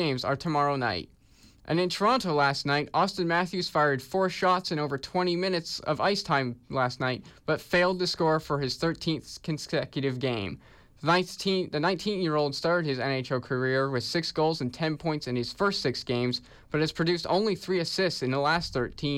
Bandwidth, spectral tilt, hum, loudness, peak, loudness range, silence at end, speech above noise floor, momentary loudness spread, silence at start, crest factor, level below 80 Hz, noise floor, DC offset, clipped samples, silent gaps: 16 kHz; -5 dB/octave; none; -28 LUFS; -14 dBFS; 2 LU; 0 s; 29 dB; 6 LU; 0 s; 14 dB; -58 dBFS; -57 dBFS; under 0.1%; under 0.1%; none